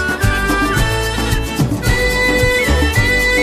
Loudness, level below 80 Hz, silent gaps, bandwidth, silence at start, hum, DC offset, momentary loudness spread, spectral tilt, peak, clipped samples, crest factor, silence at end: -14 LUFS; -20 dBFS; none; 16 kHz; 0 s; none; under 0.1%; 5 LU; -4.5 dB/octave; -2 dBFS; under 0.1%; 14 dB; 0 s